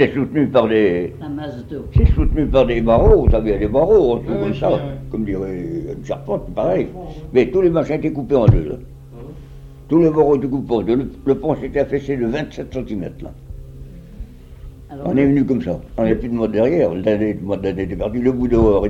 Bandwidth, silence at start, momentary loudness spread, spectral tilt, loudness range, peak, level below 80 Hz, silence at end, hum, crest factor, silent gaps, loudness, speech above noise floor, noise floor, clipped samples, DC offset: 7.6 kHz; 0 s; 19 LU; -9 dB/octave; 7 LU; 0 dBFS; -28 dBFS; 0 s; none; 18 dB; none; -18 LUFS; 20 dB; -37 dBFS; under 0.1%; under 0.1%